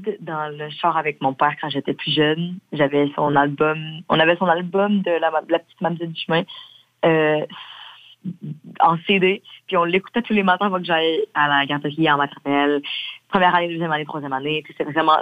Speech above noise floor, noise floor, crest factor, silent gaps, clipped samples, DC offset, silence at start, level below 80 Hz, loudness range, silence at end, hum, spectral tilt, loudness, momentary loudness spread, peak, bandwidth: 23 dB; -43 dBFS; 18 dB; none; under 0.1%; under 0.1%; 0 s; -64 dBFS; 3 LU; 0 s; none; -7.5 dB/octave; -20 LUFS; 11 LU; -2 dBFS; 8.8 kHz